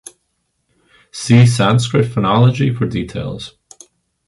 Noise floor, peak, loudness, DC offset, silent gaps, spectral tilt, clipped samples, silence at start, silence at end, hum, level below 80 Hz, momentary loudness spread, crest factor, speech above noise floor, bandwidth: -68 dBFS; 0 dBFS; -14 LUFS; under 0.1%; none; -6.5 dB/octave; under 0.1%; 1.15 s; 0.8 s; none; -44 dBFS; 17 LU; 16 dB; 55 dB; 11.5 kHz